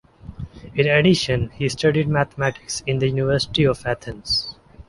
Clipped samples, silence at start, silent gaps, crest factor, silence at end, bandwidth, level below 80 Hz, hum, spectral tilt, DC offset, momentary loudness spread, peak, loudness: under 0.1%; 0.25 s; none; 18 dB; 0.05 s; 11.5 kHz; -42 dBFS; none; -5 dB/octave; under 0.1%; 12 LU; -4 dBFS; -20 LUFS